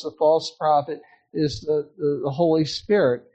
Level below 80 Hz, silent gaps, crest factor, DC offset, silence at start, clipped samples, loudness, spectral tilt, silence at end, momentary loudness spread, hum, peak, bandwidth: -56 dBFS; none; 14 dB; under 0.1%; 0 s; under 0.1%; -22 LUFS; -6 dB/octave; 0.15 s; 7 LU; none; -8 dBFS; 8.6 kHz